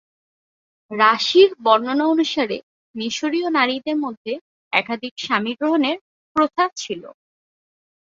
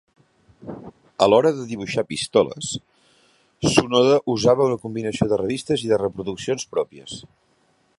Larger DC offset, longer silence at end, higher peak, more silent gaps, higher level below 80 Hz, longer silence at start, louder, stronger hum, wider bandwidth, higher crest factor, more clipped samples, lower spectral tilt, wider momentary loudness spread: neither; first, 0.95 s vs 0.8 s; about the same, 0 dBFS vs 0 dBFS; first, 2.63-2.94 s, 4.17-4.25 s, 4.41-4.71 s, 5.11-5.16 s, 6.01-6.35 s vs none; second, -68 dBFS vs -54 dBFS; first, 0.9 s vs 0.65 s; about the same, -19 LUFS vs -21 LUFS; neither; second, 7.8 kHz vs 11.5 kHz; about the same, 20 dB vs 22 dB; neither; second, -3.5 dB/octave vs -5 dB/octave; second, 16 LU vs 20 LU